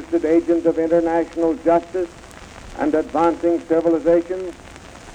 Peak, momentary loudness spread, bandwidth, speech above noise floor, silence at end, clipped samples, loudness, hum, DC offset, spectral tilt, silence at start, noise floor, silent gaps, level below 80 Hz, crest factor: -6 dBFS; 22 LU; 9.4 kHz; 21 dB; 0 s; under 0.1%; -19 LUFS; none; under 0.1%; -7 dB/octave; 0 s; -39 dBFS; none; -46 dBFS; 14 dB